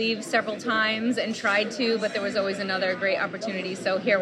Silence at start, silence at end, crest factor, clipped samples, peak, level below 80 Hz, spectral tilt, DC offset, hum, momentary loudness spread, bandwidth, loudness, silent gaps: 0 s; 0 s; 16 dB; under 0.1%; -8 dBFS; -76 dBFS; -4 dB/octave; under 0.1%; none; 4 LU; 12.5 kHz; -25 LUFS; none